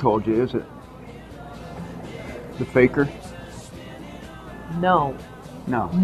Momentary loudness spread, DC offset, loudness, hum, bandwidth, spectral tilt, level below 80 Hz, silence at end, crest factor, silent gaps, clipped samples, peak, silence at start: 20 LU; under 0.1%; -23 LUFS; none; 13.5 kHz; -7.5 dB/octave; -46 dBFS; 0 s; 22 dB; none; under 0.1%; -2 dBFS; 0 s